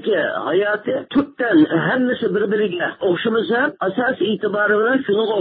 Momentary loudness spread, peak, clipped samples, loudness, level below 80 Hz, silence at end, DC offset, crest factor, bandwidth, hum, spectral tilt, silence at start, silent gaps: 5 LU; -6 dBFS; under 0.1%; -18 LUFS; -60 dBFS; 0 s; under 0.1%; 12 dB; 4.7 kHz; none; -11 dB/octave; 0 s; none